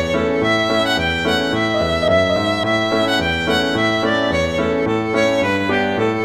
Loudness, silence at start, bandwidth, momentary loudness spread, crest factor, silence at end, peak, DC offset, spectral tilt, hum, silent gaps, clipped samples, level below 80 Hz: -17 LUFS; 0 s; 16 kHz; 2 LU; 14 dB; 0 s; -4 dBFS; 0.2%; -5 dB/octave; none; none; under 0.1%; -40 dBFS